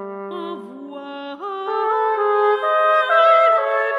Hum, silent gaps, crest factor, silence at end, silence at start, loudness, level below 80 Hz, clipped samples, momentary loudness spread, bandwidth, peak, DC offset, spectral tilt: none; none; 16 dB; 0 s; 0 s; -16 LUFS; -82 dBFS; under 0.1%; 19 LU; 9.6 kHz; -4 dBFS; under 0.1%; -4.5 dB/octave